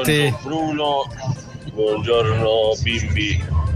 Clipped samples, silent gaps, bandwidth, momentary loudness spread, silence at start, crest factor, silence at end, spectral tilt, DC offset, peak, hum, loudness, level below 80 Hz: under 0.1%; none; 16 kHz; 10 LU; 0 s; 16 dB; 0 s; -5.5 dB/octave; under 0.1%; -4 dBFS; none; -20 LUFS; -32 dBFS